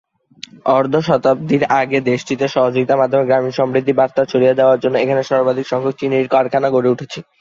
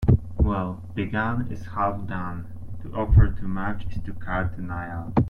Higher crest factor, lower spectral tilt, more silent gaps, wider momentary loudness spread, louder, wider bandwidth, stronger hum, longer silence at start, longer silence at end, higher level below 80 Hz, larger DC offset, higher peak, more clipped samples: about the same, 14 dB vs 18 dB; second, -6.5 dB/octave vs -9.5 dB/octave; neither; second, 5 LU vs 14 LU; first, -15 LUFS vs -26 LUFS; first, 7.6 kHz vs 5.2 kHz; neither; first, 0.65 s vs 0 s; first, 0.2 s vs 0 s; second, -58 dBFS vs -30 dBFS; neither; first, 0 dBFS vs -6 dBFS; neither